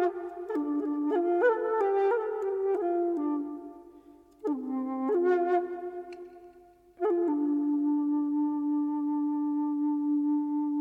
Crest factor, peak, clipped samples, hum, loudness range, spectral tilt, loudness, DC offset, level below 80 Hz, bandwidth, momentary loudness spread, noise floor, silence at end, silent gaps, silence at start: 16 dB; -14 dBFS; under 0.1%; none; 3 LU; -7 dB/octave; -29 LUFS; under 0.1%; -72 dBFS; 3.8 kHz; 12 LU; -56 dBFS; 0 s; none; 0 s